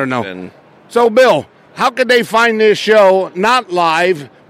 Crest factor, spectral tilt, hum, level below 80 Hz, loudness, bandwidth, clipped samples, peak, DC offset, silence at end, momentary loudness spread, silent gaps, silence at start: 12 dB; -4 dB/octave; none; -60 dBFS; -12 LUFS; 16.5 kHz; under 0.1%; -2 dBFS; under 0.1%; 0.25 s; 9 LU; none; 0 s